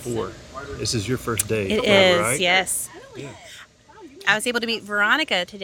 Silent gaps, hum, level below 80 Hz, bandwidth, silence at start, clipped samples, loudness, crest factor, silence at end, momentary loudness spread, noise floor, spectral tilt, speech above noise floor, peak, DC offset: none; none; -50 dBFS; 18 kHz; 0 s; under 0.1%; -20 LUFS; 22 dB; 0 s; 21 LU; -46 dBFS; -3 dB/octave; 24 dB; -2 dBFS; under 0.1%